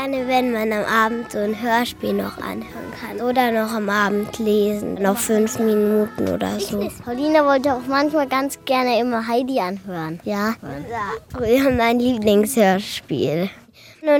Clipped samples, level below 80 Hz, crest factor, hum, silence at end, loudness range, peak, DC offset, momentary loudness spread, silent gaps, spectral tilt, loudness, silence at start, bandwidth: under 0.1%; -50 dBFS; 16 dB; none; 0 s; 2 LU; -4 dBFS; under 0.1%; 10 LU; none; -5 dB/octave; -20 LUFS; 0 s; 19 kHz